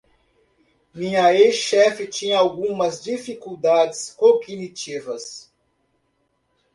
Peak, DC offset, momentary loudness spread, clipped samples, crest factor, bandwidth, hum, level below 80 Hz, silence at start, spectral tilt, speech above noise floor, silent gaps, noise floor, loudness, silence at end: -4 dBFS; under 0.1%; 16 LU; under 0.1%; 18 dB; 11.5 kHz; none; -66 dBFS; 0.95 s; -3.5 dB/octave; 50 dB; none; -69 dBFS; -20 LUFS; 1.35 s